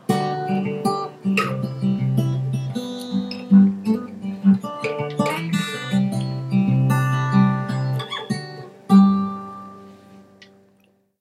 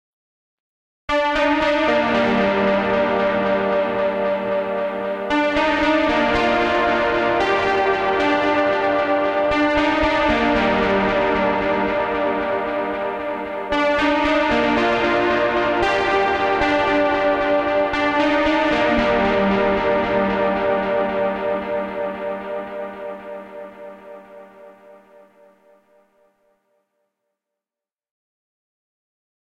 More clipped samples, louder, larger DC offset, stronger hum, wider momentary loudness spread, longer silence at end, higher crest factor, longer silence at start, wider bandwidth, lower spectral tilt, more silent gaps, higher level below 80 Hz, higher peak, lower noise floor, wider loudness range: neither; about the same, -21 LUFS vs -19 LUFS; neither; neither; first, 13 LU vs 8 LU; second, 0.75 s vs 4.55 s; about the same, 18 dB vs 14 dB; second, 0.1 s vs 1.1 s; first, 13.5 kHz vs 9 kHz; first, -7 dB/octave vs -5.5 dB/octave; neither; second, -60 dBFS vs -42 dBFS; about the same, -4 dBFS vs -6 dBFS; second, -60 dBFS vs under -90 dBFS; second, 3 LU vs 7 LU